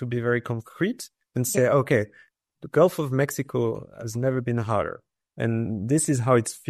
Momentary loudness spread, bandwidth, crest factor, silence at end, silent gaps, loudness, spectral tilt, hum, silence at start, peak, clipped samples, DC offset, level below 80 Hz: 12 LU; 13.5 kHz; 20 dB; 0 s; none; -25 LUFS; -6 dB/octave; none; 0 s; -6 dBFS; under 0.1%; under 0.1%; -62 dBFS